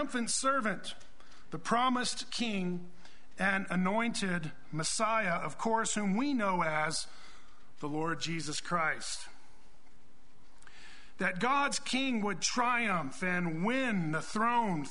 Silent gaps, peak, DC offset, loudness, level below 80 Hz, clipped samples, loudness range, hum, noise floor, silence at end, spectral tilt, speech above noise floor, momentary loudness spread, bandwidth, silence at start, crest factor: none; -14 dBFS; 1%; -32 LUFS; -64 dBFS; under 0.1%; 6 LU; none; -63 dBFS; 0 s; -3.5 dB/octave; 31 dB; 11 LU; 11 kHz; 0 s; 20 dB